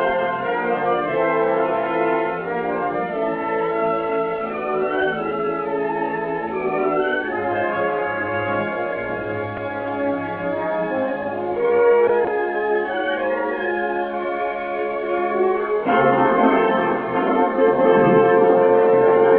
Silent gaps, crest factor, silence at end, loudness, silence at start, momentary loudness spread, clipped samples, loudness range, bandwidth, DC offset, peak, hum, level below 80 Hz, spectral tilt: none; 16 dB; 0 s; -20 LUFS; 0 s; 9 LU; under 0.1%; 6 LU; 4 kHz; under 0.1%; -4 dBFS; none; -56 dBFS; -10 dB/octave